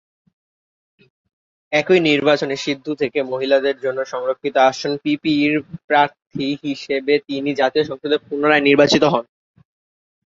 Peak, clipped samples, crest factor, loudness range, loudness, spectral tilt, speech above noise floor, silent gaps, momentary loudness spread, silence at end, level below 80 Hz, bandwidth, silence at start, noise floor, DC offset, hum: -2 dBFS; under 0.1%; 18 dB; 2 LU; -18 LUFS; -5 dB/octave; over 72 dB; 5.84-5.88 s; 9 LU; 1.05 s; -62 dBFS; 7.8 kHz; 1.7 s; under -90 dBFS; under 0.1%; none